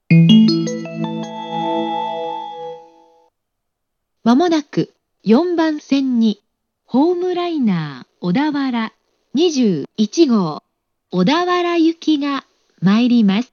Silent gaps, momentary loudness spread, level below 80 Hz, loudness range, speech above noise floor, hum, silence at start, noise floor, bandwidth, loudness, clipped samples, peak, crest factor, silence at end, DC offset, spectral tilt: none; 13 LU; -68 dBFS; 5 LU; 60 dB; none; 0.1 s; -76 dBFS; 7 kHz; -17 LUFS; under 0.1%; 0 dBFS; 16 dB; 0.1 s; under 0.1%; -6.5 dB/octave